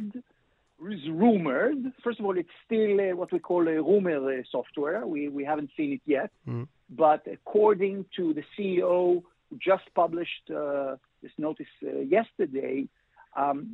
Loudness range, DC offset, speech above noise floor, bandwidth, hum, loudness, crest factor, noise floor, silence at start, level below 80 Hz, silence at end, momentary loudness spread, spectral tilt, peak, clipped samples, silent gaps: 4 LU; under 0.1%; 42 dB; 4.1 kHz; none; -28 LUFS; 18 dB; -69 dBFS; 0 s; -74 dBFS; 0 s; 13 LU; -9.5 dB/octave; -10 dBFS; under 0.1%; none